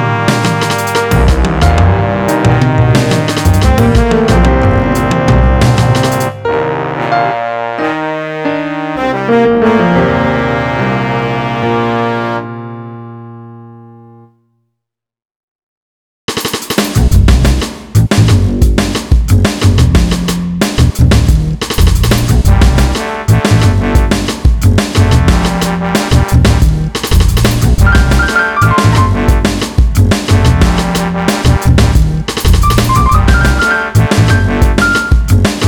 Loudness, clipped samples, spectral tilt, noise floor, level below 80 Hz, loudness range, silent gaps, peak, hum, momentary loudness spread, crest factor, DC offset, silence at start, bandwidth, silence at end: -10 LUFS; under 0.1%; -6 dB/octave; -77 dBFS; -14 dBFS; 5 LU; 15.25-16.28 s; 0 dBFS; none; 7 LU; 10 dB; under 0.1%; 0 s; 19.5 kHz; 0 s